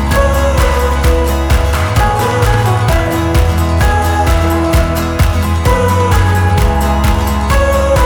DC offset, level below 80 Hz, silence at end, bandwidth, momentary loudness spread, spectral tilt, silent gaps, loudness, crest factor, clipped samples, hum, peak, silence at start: under 0.1%; -14 dBFS; 0 s; 19.5 kHz; 2 LU; -6 dB/octave; none; -12 LUFS; 10 dB; under 0.1%; none; 0 dBFS; 0 s